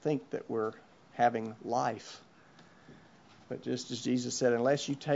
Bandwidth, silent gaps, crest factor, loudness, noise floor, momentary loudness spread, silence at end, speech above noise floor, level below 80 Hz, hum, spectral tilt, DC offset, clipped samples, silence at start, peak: 8 kHz; none; 20 dB; -33 LUFS; -59 dBFS; 15 LU; 0 s; 27 dB; -78 dBFS; none; -5 dB/octave; under 0.1%; under 0.1%; 0.05 s; -14 dBFS